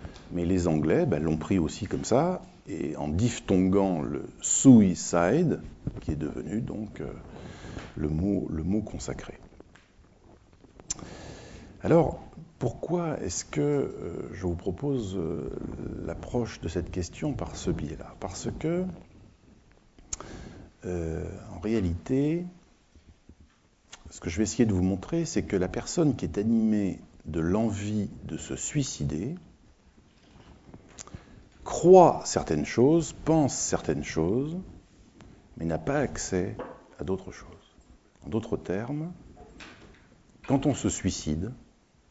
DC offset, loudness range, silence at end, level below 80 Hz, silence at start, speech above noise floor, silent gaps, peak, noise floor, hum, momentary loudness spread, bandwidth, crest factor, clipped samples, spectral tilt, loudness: under 0.1%; 12 LU; 0.5 s; -48 dBFS; 0 s; 34 dB; none; -4 dBFS; -61 dBFS; none; 18 LU; 8 kHz; 24 dB; under 0.1%; -6 dB/octave; -28 LUFS